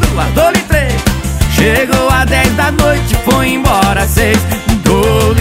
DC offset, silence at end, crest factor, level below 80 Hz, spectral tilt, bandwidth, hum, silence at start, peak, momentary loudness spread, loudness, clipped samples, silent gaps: under 0.1%; 0 s; 10 dB; -18 dBFS; -5 dB/octave; 16.5 kHz; none; 0 s; 0 dBFS; 3 LU; -11 LUFS; under 0.1%; none